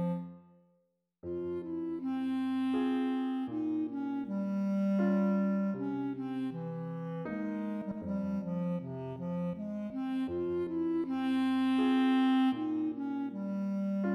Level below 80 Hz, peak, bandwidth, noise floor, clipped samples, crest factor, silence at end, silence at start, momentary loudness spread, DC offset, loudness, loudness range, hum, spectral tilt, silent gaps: -70 dBFS; -22 dBFS; 6 kHz; -76 dBFS; under 0.1%; 12 dB; 0 s; 0 s; 10 LU; under 0.1%; -33 LUFS; 6 LU; none; -8.5 dB/octave; none